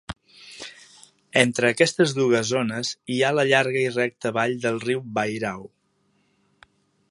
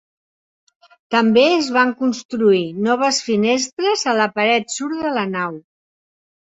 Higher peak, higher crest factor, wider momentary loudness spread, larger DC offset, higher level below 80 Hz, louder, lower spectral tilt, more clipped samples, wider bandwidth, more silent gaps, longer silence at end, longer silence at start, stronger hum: about the same, 0 dBFS vs -2 dBFS; first, 24 dB vs 18 dB; first, 19 LU vs 8 LU; neither; about the same, -60 dBFS vs -64 dBFS; second, -22 LUFS vs -17 LUFS; about the same, -4 dB/octave vs -3.5 dB/octave; neither; first, 11.5 kHz vs 8.2 kHz; second, none vs 2.25-2.29 s, 3.73-3.77 s; first, 1.45 s vs 0.9 s; second, 0.1 s vs 1.1 s; neither